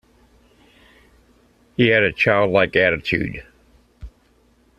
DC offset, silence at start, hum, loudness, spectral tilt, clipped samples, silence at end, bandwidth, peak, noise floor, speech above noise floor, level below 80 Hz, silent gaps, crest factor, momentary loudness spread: under 0.1%; 1.8 s; none; -17 LUFS; -7 dB/octave; under 0.1%; 0.7 s; 12.5 kHz; 0 dBFS; -58 dBFS; 40 dB; -48 dBFS; none; 22 dB; 14 LU